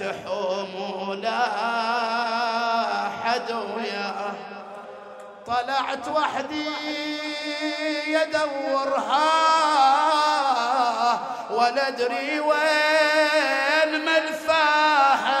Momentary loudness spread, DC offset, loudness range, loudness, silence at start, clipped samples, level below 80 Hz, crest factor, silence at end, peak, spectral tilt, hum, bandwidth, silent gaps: 11 LU; under 0.1%; 7 LU; -22 LUFS; 0 s; under 0.1%; -72 dBFS; 16 dB; 0 s; -8 dBFS; -2.5 dB/octave; none; 15.5 kHz; none